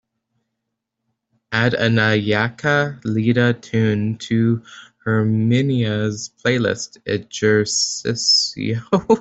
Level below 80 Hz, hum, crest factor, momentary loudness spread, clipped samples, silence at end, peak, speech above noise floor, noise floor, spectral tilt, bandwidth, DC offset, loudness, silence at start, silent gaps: -56 dBFS; none; 16 dB; 9 LU; under 0.1%; 0 s; -2 dBFS; 60 dB; -79 dBFS; -4.5 dB/octave; 8.2 kHz; under 0.1%; -19 LUFS; 1.5 s; none